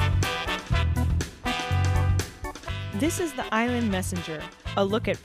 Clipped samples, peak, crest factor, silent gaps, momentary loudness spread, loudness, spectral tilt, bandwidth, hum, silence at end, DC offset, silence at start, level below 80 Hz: under 0.1%; -10 dBFS; 16 dB; none; 10 LU; -27 LUFS; -5.5 dB/octave; 15.5 kHz; none; 0 s; under 0.1%; 0 s; -36 dBFS